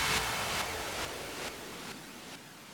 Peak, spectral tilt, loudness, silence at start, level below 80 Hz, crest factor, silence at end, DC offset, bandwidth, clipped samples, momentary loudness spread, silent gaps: -18 dBFS; -2 dB/octave; -36 LUFS; 0 s; -54 dBFS; 20 dB; 0 s; under 0.1%; 19 kHz; under 0.1%; 15 LU; none